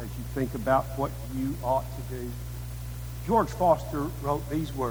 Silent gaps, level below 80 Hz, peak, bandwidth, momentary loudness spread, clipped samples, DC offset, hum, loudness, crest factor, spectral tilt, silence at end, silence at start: none; -40 dBFS; -8 dBFS; over 20 kHz; 13 LU; under 0.1%; under 0.1%; 60 Hz at -35 dBFS; -29 LUFS; 20 dB; -7 dB/octave; 0 s; 0 s